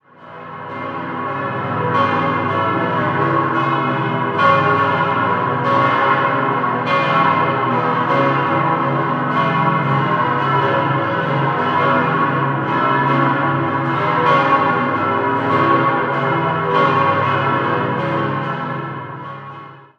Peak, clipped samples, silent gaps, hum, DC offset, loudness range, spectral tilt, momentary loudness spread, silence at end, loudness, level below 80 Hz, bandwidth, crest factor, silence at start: -2 dBFS; under 0.1%; none; none; under 0.1%; 2 LU; -8 dB/octave; 9 LU; 0.2 s; -16 LUFS; -60 dBFS; 7 kHz; 16 dB; 0.2 s